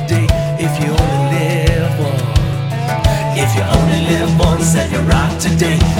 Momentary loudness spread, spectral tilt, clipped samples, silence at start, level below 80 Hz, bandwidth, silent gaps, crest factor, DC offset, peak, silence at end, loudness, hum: 3 LU; -5.5 dB/octave; under 0.1%; 0 s; -22 dBFS; 17 kHz; none; 12 dB; under 0.1%; 0 dBFS; 0 s; -14 LUFS; none